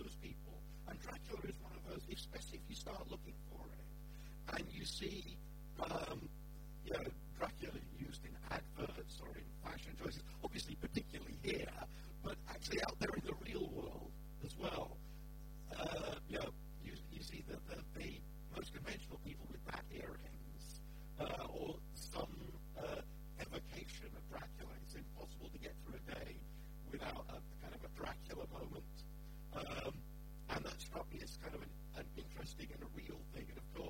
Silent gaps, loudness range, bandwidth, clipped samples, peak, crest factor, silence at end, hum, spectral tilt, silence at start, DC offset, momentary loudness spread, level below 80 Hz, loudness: none; 6 LU; 16.5 kHz; under 0.1%; -26 dBFS; 22 dB; 0 s; none; -5 dB/octave; 0 s; under 0.1%; 10 LU; -54 dBFS; -49 LUFS